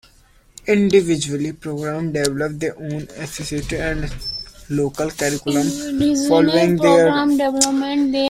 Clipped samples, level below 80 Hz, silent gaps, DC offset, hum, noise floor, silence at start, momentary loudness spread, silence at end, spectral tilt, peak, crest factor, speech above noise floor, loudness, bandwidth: under 0.1%; -40 dBFS; none; under 0.1%; none; -52 dBFS; 0.65 s; 13 LU; 0 s; -4.5 dB/octave; 0 dBFS; 18 dB; 34 dB; -19 LUFS; 16 kHz